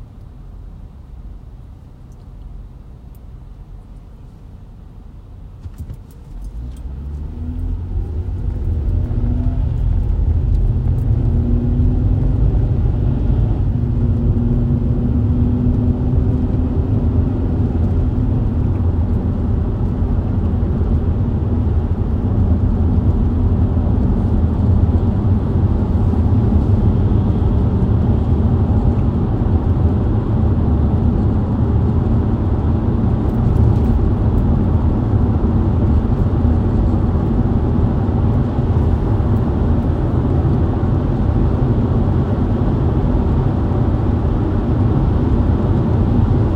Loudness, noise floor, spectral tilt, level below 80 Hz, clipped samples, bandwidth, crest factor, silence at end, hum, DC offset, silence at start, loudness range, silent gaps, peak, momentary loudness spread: -17 LUFS; -37 dBFS; -11 dB/octave; -20 dBFS; under 0.1%; 4.5 kHz; 14 dB; 0 s; none; under 0.1%; 0 s; 7 LU; none; -2 dBFS; 8 LU